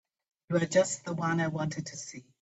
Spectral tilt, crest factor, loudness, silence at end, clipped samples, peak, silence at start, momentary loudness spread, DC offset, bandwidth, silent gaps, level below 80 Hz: -5 dB/octave; 20 dB; -30 LUFS; 0.2 s; under 0.1%; -12 dBFS; 0.5 s; 13 LU; under 0.1%; 8.4 kHz; none; -70 dBFS